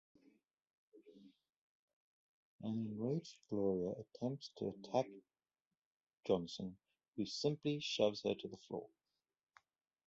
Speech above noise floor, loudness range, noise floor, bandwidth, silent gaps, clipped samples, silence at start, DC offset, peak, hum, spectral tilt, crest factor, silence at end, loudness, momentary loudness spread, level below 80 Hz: over 49 dB; 4 LU; under -90 dBFS; 7.6 kHz; 1.56-2.59 s, 5.67-5.71 s, 5.77-6.07 s, 7.08-7.13 s; under 0.1%; 0.95 s; under 0.1%; -20 dBFS; none; -5.5 dB/octave; 24 dB; 1.2 s; -42 LUFS; 12 LU; -78 dBFS